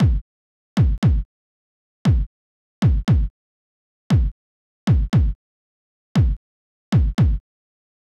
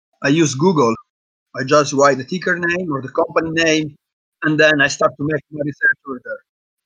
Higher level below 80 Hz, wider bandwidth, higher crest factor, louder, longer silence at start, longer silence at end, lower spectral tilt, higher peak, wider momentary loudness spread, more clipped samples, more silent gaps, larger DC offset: first, -26 dBFS vs -58 dBFS; about the same, 8.8 kHz vs 9.6 kHz; about the same, 12 dB vs 16 dB; second, -21 LUFS vs -17 LUFS; second, 0 s vs 0.2 s; first, 0.8 s vs 0.5 s; first, -8 dB/octave vs -4.5 dB/octave; second, -8 dBFS vs 0 dBFS; second, 12 LU vs 15 LU; neither; first, 0.21-0.76 s, 0.98-1.02 s, 1.25-2.05 s, 2.26-2.82 s, 3.30-4.10 s, 4.32-4.87 s, 5.35-6.15 s, 6.37-6.92 s vs 1.10-1.46 s, 4.13-4.32 s; neither